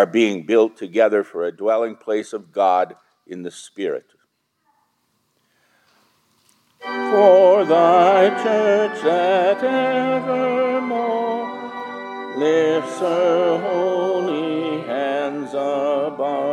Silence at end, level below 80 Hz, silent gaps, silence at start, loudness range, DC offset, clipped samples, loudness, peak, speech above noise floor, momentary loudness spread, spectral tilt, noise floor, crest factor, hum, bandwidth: 0 s; -78 dBFS; none; 0 s; 15 LU; under 0.1%; under 0.1%; -18 LUFS; -2 dBFS; 51 dB; 16 LU; -5.5 dB/octave; -68 dBFS; 18 dB; none; 11 kHz